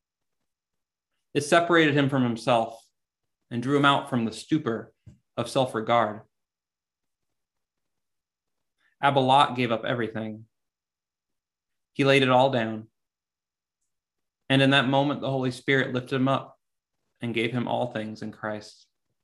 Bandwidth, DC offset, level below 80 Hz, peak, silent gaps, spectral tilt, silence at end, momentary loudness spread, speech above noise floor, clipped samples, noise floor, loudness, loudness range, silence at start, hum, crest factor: 12.5 kHz; under 0.1%; -70 dBFS; -6 dBFS; none; -5.5 dB/octave; 0.55 s; 15 LU; over 66 dB; under 0.1%; under -90 dBFS; -24 LUFS; 6 LU; 1.35 s; none; 22 dB